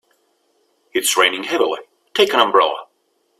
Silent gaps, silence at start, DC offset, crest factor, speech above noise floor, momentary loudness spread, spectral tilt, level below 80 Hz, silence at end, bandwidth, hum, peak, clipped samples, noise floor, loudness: none; 0.95 s; under 0.1%; 20 dB; 49 dB; 11 LU; -0.5 dB/octave; -66 dBFS; 0.55 s; 16 kHz; none; 0 dBFS; under 0.1%; -65 dBFS; -17 LUFS